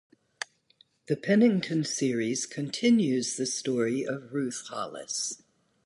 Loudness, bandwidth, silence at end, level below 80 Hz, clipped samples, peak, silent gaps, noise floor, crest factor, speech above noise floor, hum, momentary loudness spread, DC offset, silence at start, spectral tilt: -28 LUFS; 11.5 kHz; 0.5 s; -76 dBFS; under 0.1%; -12 dBFS; none; -65 dBFS; 18 dB; 37 dB; none; 14 LU; under 0.1%; 0.4 s; -4.5 dB/octave